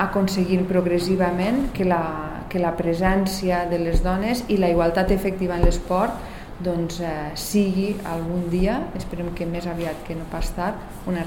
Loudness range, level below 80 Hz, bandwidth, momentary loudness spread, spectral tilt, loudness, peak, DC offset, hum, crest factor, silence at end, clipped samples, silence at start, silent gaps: 4 LU; -32 dBFS; 16.5 kHz; 9 LU; -6.5 dB/octave; -23 LUFS; -4 dBFS; 0.4%; none; 18 dB; 0 s; under 0.1%; 0 s; none